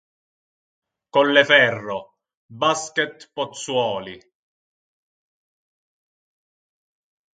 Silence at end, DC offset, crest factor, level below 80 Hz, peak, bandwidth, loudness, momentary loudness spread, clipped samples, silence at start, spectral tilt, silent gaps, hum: 3.15 s; under 0.1%; 24 dB; -70 dBFS; 0 dBFS; 9.4 kHz; -19 LUFS; 17 LU; under 0.1%; 1.15 s; -3 dB/octave; 2.37-2.49 s; none